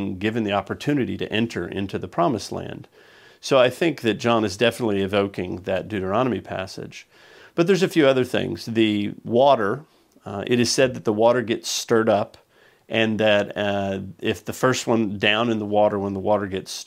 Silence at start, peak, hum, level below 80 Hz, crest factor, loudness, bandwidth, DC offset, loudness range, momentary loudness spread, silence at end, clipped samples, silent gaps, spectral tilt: 0 s; -2 dBFS; none; -62 dBFS; 20 dB; -22 LUFS; 16 kHz; under 0.1%; 3 LU; 12 LU; 0.05 s; under 0.1%; none; -5 dB/octave